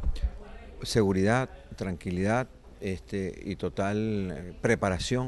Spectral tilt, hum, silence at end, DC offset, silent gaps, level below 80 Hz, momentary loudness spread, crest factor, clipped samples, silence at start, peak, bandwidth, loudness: -6 dB/octave; none; 0 s; under 0.1%; none; -40 dBFS; 12 LU; 20 dB; under 0.1%; 0 s; -10 dBFS; 12.5 kHz; -30 LUFS